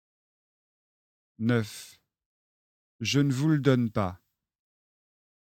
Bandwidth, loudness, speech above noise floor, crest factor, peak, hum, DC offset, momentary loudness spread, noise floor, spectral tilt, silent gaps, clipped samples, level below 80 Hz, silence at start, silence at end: 16.5 kHz; -27 LUFS; over 64 dB; 22 dB; -10 dBFS; none; under 0.1%; 10 LU; under -90 dBFS; -6 dB/octave; 2.26-2.99 s; under 0.1%; -64 dBFS; 1.4 s; 1.3 s